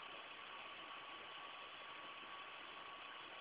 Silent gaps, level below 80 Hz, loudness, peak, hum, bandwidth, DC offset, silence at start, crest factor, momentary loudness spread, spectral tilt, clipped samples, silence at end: none; -88 dBFS; -52 LUFS; -40 dBFS; none; 4 kHz; under 0.1%; 0 s; 14 dB; 1 LU; 1.5 dB/octave; under 0.1%; 0 s